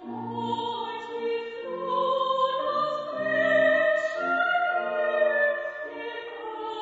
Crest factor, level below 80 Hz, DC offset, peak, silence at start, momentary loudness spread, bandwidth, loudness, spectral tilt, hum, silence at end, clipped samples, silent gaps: 16 dB; -74 dBFS; under 0.1%; -12 dBFS; 0 s; 13 LU; 7.8 kHz; -26 LUFS; -5 dB/octave; none; 0 s; under 0.1%; none